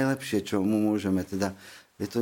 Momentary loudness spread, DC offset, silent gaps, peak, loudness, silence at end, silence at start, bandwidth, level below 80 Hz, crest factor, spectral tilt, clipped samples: 14 LU; under 0.1%; none; -10 dBFS; -28 LUFS; 0 s; 0 s; 17 kHz; -64 dBFS; 16 dB; -6 dB/octave; under 0.1%